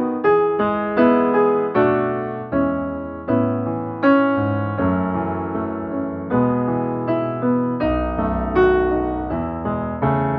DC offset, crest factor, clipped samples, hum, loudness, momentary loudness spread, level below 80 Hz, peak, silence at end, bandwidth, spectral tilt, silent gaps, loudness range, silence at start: under 0.1%; 16 dB; under 0.1%; none; -20 LUFS; 9 LU; -38 dBFS; -4 dBFS; 0 s; 5.2 kHz; -7 dB/octave; none; 3 LU; 0 s